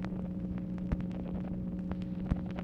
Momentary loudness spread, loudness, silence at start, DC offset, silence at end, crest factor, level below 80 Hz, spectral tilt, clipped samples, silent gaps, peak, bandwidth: 2 LU; -37 LUFS; 0 s; under 0.1%; 0 s; 20 dB; -44 dBFS; -10 dB/octave; under 0.1%; none; -16 dBFS; 6 kHz